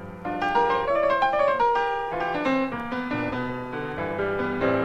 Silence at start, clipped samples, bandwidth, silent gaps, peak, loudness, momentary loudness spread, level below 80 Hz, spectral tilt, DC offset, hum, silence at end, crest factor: 0 s; under 0.1%; 9.2 kHz; none; -10 dBFS; -25 LUFS; 9 LU; -48 dBFS; -6.5 dB/octave; under 0.1%; none; 0 s; 14 dB